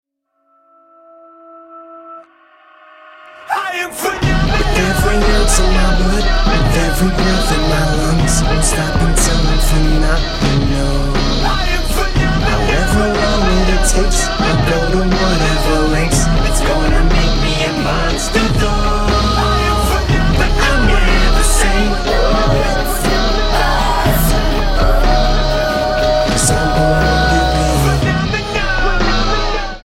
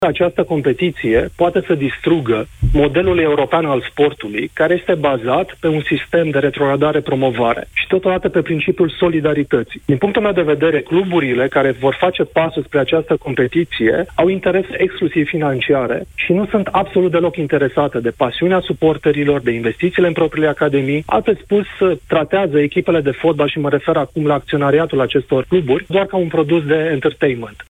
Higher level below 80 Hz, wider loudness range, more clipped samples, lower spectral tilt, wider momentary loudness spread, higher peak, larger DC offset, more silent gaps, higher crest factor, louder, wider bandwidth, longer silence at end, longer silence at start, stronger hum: first, -16 dBFS vs -36 dBFS; about the same, 2 LU vs 1 LU; neither; second, -4.5 dB/octave vs -7.5 dB/octave; about the same, 3 LU vs 3 LU; about the same, -2 dBFS vs -2 dBFS; neither; neither; about the same, 10 dB vs 12 dB; about the same, -14 LUFS vs -16 LUFS; first, 15.5 kHz vs 10.5 kHz; about the same, 0.05 s vs 0.05 s; first, 1.55 s vs 0 s; neither